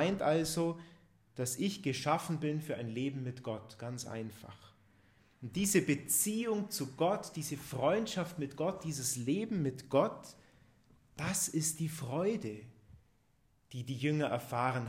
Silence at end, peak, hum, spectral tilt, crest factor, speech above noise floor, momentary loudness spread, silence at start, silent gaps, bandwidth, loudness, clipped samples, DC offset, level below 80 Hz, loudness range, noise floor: 0 s; -16 dBFS; none; -4.5 dB/octave; 20 dB; 37 dB; 14 LU; 0 s; none; 16 kHz; -35 LUFS; under 0.1%; under 0.1%; -68 dBFS; 4 LU; -72 dBFS